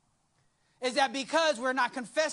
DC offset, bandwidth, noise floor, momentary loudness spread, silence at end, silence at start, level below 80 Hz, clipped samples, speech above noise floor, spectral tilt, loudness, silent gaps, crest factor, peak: under 0.1%; 11.5 kHz; -72 dBFS; 4 LU; 0 s; 0.8 s; -78 dBFS; under 0.1%; 43 dB; -1.5 dB/octave; -29 LUFS; none; 18 dB; -14 dBFS